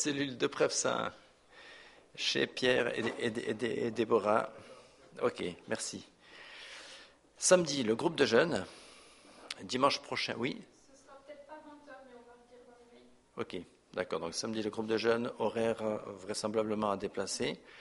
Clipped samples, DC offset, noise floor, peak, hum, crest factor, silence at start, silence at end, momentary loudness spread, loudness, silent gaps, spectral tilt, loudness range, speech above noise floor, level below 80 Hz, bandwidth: under 0.1%; under 0.1%; -61 dBFS; -10 dBFS; none; 24 dB; 0 s; 0 s; 23 LU; -33 LUFS; none; -3.5 dB/octave; 10 LU; 28 dB; -70 dBFS; 11.5 kHz